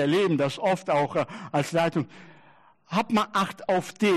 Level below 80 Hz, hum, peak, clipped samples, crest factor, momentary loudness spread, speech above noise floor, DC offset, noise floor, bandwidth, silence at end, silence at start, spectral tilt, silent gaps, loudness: -68 dBFS; none; -12 dBFS; under 0.1%; 12 dB; 6 LU; 32 dB; under 0.1%; -57 dBFS; 13 kHz; 0 s; 0 s; -5.5 dB/octave; none; -26 LUFS